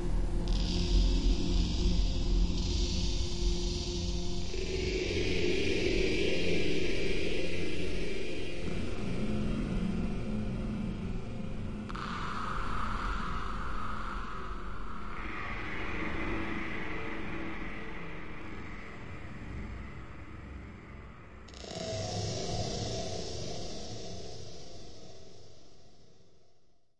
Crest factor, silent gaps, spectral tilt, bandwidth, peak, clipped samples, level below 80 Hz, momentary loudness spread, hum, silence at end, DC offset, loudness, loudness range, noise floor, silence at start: 16 dB; none; -5 dB/octave; 10.5 kHz; -16 dBFS; under 0.1%; -38 dBFS; 15 LU; none; 0 s; 1%; -35 LUFS; 12 LU; -65 dBFS; 0 s